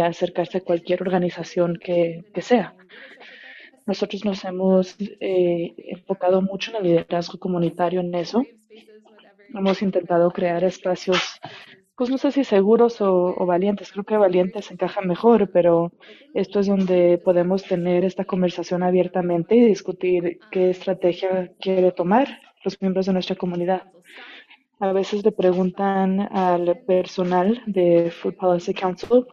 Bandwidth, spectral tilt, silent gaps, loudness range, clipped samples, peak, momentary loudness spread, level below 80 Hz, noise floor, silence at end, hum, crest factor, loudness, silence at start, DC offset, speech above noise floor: 7.4 kHz; -7 dB/octave; none; 5 LU; under 0.1%; -4 dBFS; 10 LU; -64 dBFS; -48 dBFS; 0.05 s; none; 16 dB; -21 LUFS; 0 s; under 0.1%; 27 dB